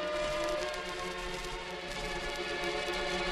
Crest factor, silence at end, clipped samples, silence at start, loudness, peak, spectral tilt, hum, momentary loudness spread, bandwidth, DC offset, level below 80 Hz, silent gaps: 18 dB; 0 s; under 0.1%; 0 s; -35 LUFS; -18 dBFS; -3 dB/octave; none; 5 LU; 13 kHz; under 0.1%; -48 dBFS; none